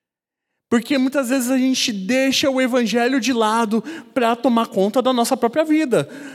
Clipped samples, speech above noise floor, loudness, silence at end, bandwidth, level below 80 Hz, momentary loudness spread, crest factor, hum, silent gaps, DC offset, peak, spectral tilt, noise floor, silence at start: under 0.1%; 66 dB; -18 LUFS; 0 s; 15.5 kHz; -70 dBFS; 4 LU; 16 dB; none; none; under 0.1%; -2 dBFS; -4 dB/octave; -85 dBFS; 0.7 s